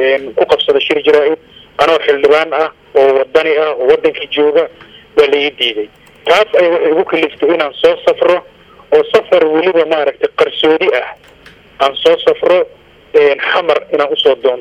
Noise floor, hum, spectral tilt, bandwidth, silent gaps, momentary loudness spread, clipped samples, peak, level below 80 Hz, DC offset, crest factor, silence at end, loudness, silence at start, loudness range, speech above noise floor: -39 dBFS; none; -4 dB/octave; 9 kHz; none; 6 LU; 0.2%; 0 dBFS; -52 dBFS; under 0.1%; 12 dB; 0 s; -12 LUFS; 0 s; 1 LU; 28 dB